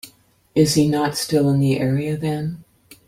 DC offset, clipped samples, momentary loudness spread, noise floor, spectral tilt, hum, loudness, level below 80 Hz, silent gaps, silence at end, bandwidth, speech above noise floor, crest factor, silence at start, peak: under 0.1%; under 0.1%; 10 LU; -54 dBFS; -6 dB/octave; none; -19 LUFS; -52 dBFS; none; 0.45 s; 16.5 kHz; 35 dB; 18 dB; 0.05 s; -2 dBFS